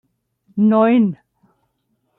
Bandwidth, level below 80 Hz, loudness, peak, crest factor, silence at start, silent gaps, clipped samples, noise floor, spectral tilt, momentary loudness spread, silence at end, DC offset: 4 kHz; -68 dBFS; -16 LUFS; -4 dBFS; 14 dB; 0.55 s; none; under 0.1%; -69 dBFS; -11 dB/octave; 18 LU; 1.05 s; under 0.1%